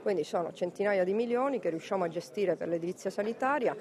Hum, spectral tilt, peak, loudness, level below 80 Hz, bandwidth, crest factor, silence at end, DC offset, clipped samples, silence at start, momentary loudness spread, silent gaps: none; -6 dB/octave; -16 dBFS; -32 LUFS; -80 dBFS; 13.5 kHz; 14 dB; 0 s; under 0.1%; under 0.1%; 0 s; 5 LU; none